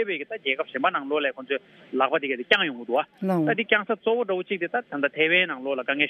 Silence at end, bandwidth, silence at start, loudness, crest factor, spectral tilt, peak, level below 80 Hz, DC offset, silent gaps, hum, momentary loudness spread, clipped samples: 0 s; 12.5 kHz; 0 s; -25 LUFS; 24 dB; -6 dB/octave; -2 dBFS; -80 dBFS; under 0.1%; none; none; 7 LU; under 0.1%